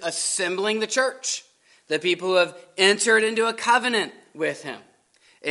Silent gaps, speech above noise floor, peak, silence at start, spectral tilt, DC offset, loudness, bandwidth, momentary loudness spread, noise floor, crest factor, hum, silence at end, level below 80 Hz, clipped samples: none; 37 dB; -2 dBFS; 0 s; -1.5 dB/octave; under 0.1%; -22 LUFS; 11.5 kHz; 13 LU; -60 dBFS; 22 dB; none; 0 s; -82 dBFS; under 0.1%